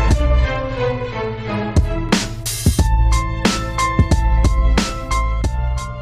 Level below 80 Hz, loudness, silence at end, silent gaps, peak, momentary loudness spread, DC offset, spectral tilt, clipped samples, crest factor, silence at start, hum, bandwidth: -18 dBFS; -19 LUFS; 0 s; none; -2 dBFS; 7 LU; under 0.1%; -5 dB/octave; under 0.1%; 16 dB; 0 s; none; 15.5 kHz